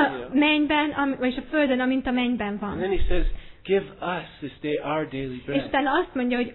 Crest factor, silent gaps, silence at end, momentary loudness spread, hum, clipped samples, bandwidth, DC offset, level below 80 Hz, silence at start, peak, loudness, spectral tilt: 18 dB; none; 0 s; 10 LU; none; under 0.1%; 4.2 kHz; under 0.1%; -34 dBFS; 0 s; -6 dBFS; -25 LUFS; -9 dB/octave